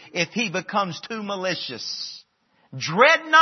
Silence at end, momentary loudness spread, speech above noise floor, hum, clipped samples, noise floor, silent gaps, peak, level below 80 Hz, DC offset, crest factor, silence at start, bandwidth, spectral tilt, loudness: 0 s; 16 LU; 42 dB; none; under 0.1%; -64 dBFS; none; -2 dBFS; -76 dBFS; under 0.1%; 22 dB; 0 s; 6.4 kHz; -3.5 dB/octave; -22 LUFS